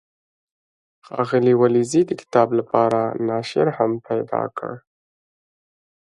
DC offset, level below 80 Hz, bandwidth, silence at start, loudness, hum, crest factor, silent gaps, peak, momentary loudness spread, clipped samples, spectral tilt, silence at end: under 0.1%; -66 dBFS; 11.5 kHz; 1.1 s; -20 LUFS; none; 20 dB; none; -2 dBFS; 12 LU; under 0.1%; -6.5 dB/octave; 1.35 s